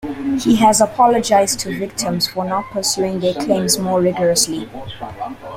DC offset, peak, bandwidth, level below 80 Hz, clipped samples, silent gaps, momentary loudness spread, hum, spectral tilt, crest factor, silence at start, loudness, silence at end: under 0.1%; -2 dBFS; 16.5 kHz; -48 dBFS; under 0.1%; none; 15 LU; none; -3.5 dB/octave; 16 dB; 0 s; -16 LUFS; 0 s